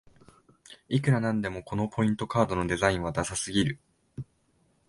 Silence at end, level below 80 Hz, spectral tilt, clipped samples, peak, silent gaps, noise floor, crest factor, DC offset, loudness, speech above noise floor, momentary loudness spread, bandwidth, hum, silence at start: 0.65 s; -50 dBFS; -5.5 dB/octave; under 0.1%; -6 dBFS; none; -68 dBFS; 22 dB; under 0.1%; -28 LUFS; 41 dB; 18 LU; 11.5 kHz; none; 0.7 s